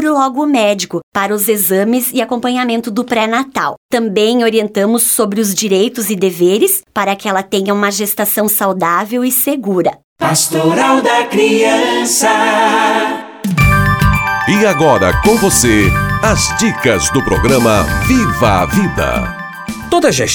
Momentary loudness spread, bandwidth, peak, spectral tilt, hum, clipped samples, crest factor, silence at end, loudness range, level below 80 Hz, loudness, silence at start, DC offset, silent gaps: 6 LU; over 20 kHz; 0 dBFS; -4 dB/octave; none; under 0.1%; 12 dB; 0 s; 3 LU; -28 dBFS; -12 LUFS; 0 s; under 0.1%; 1.03-1.12 s, 3.77-3.89 s, 10.04-10.16 s